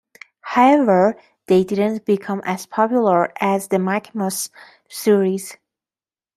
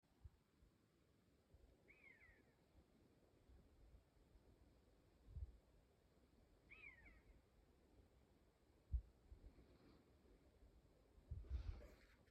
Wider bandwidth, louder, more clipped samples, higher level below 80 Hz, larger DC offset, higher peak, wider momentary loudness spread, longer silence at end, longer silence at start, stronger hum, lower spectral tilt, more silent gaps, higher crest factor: first, 14.5 kHz vs 8.4 kHz; first, -18 LUFS vs -58 LUFS; neither; about the same, -66 dBFS vs -62 dBFS; neither; first, -2 dBFS vs -36 dBFS; about the same, 13 LU vs 15 LU; first, 0.8 s vs 0 s; first, 0.45 s vs 0.05 s; neither; second, -5.5 dB/octave vs -7 dB/octave; neither; second, 18 dB vs 26 dB